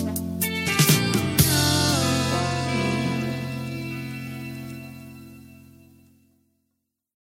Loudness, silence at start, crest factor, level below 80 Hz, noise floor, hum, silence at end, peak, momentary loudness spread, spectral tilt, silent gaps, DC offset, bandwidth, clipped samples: -23 LUFS; 0 s; 20 dB; -48 dBFS; -78 dBFS; none; 1.8 s; -4 dBFS; 19 LU; -4 dB/octave; none; under 0.1%; 16.5 kHz; under 0.1%